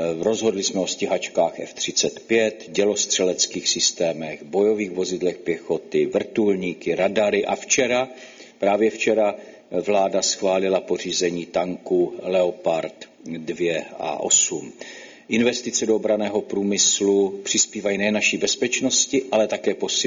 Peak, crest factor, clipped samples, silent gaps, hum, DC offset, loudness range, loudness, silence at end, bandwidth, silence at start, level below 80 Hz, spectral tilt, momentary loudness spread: -4 dBFS; 18 dB; under 0.1%; none; none; under 0.1%; 3 LU; -21 LUFS; 0 s; 7.6 kHz; 0 s; -64 dBFS; -2.5 dB/octave; 8 LU